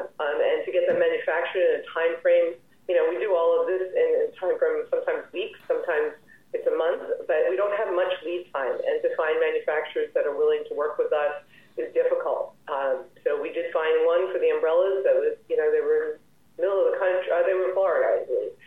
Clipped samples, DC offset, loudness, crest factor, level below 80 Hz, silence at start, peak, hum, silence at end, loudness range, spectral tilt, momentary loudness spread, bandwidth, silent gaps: under 0.1%; 0.1%; -25 LUFS; 14 dB; -76 dBFS; 0 s; -10 dBFS; none; 0.15 s; 3 LU; -5.5 dB/octave; 7 LU; 3.9 kHz; none